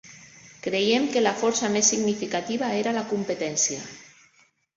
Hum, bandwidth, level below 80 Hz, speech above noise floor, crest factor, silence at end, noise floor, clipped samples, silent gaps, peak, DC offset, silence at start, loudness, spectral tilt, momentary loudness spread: none; 8 kHz; -68 dBFS; 38 dB; 20 dB; 0.7 s; -62 dBFS; under 0.1%; none; -6 dBFS; under 0.1%; 0.05 s; -24 LUFS; -2.5 dB/octave; 8 LU